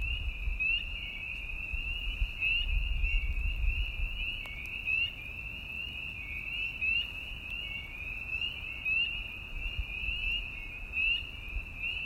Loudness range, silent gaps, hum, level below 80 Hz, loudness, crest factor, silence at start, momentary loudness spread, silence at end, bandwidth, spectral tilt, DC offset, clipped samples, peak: 2 LU; none; none; -38 dBFS; -33 LUFS; 16 dB; 0 s; 9 LU; 0 s; 15.5 kHz; -4 dB/octave; under 0.1%; under 0.1%; -18 dBFS